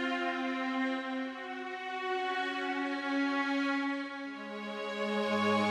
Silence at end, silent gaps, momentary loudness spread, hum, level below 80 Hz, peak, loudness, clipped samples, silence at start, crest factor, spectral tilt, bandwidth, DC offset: 0 s; none; 9 LU; none; -80 dBFS; -18 dBFS; -34 LUFS; under 0.1%; 0 s; 16 dB; -5 dB/octave; 11 kHz; under 0.1%